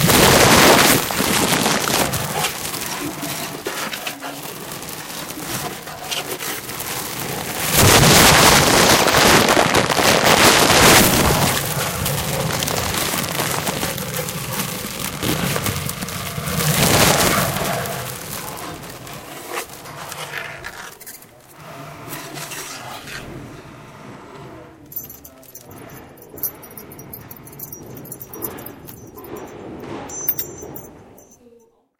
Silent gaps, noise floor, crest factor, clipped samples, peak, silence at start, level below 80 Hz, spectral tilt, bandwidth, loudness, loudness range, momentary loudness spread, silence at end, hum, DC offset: none; -53 dBFS; 20 dB; under 0.1%; 0 dBFS; 0 s; -38 dBFS; -3 dB/octave; 17.5 kHz; -16 LUFS; 21 LU; 24 LU; 0.95 s; none; under 0.1%